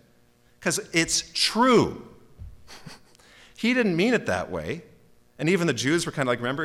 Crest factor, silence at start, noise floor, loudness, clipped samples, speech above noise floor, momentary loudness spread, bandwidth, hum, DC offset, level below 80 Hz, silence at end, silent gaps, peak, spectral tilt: 16 dB; 0.6 s; -59 dBFS; -24 LUFS; under 0.1%; 36 dB; 16 LU; 16.5 kHz; none; under 0.1%; -54 dBFS; 0 s; none; -10 dBFS; -4 dB/octave